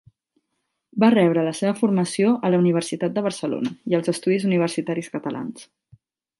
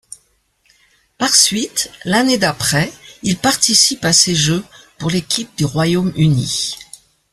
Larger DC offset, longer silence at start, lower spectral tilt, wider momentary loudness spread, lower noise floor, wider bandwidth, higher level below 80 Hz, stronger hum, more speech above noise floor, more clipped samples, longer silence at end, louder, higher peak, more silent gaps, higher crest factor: neither; second, 0.95 s vs 1.2 s; first, -6.5 dB/octave vs -3 dB/octave; about the same, 11 LU vs 11 LU; first, -77 dBFS vs -60 dBFS; second, 11.5 kHz vs 14 kHz; second, -70 dBFS vs -48 dBFS; neither; first, 56 dB vs 45 dB; neither; first, 0.75 s vs 0.5 s; second, -22 LUFS vs -14 LUFS; second, -4 dBFS vs 0 dBFS; neither; about the same, 18 dB vs 18 dB